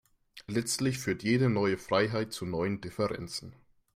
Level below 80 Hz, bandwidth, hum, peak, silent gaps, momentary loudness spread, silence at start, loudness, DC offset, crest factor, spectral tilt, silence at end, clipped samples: -62 dBFS; 16 kHz; none; -12 dBFS; none; 10 LU; 0.35 s; -31 LUFS; under 0.1%; 18 dB; -5 dB/octave; 0.45 s; under 0.1%